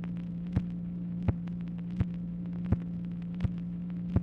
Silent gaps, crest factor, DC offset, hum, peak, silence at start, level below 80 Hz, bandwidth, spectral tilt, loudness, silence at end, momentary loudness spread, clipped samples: none; 20 dB; under 0.1%; none; -12 dBFS; 0 s; -46 dBFS; 4.2 kHz; -10.5 dB/octave; -35 LUFS; 0 s; 5 LU; under 0.1%